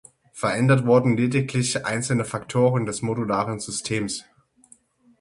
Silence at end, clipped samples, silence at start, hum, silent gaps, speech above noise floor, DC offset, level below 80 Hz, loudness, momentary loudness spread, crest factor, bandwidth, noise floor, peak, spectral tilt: 1 s; under 0.1%; 0.35 s; none; none; 34 dB; under 0.1%; -58 dBFS; -23 LUFS; 8 LU; 18 dB; 11.5 kHz; -56 dBFS; -4 dBFS; -5.5 dB/octave